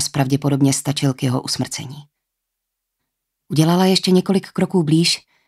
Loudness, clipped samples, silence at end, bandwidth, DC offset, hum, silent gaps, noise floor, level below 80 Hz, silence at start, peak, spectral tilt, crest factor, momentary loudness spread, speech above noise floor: -18 LUFS; under 0.1%; 0.3 s; 14.5 kHz; under 0.1%; none; none; -79 dBFS; -60 dBFS; 0 s; -2 dBFS; -5 dB/octave; 16 dB; 8 LU; 62 dB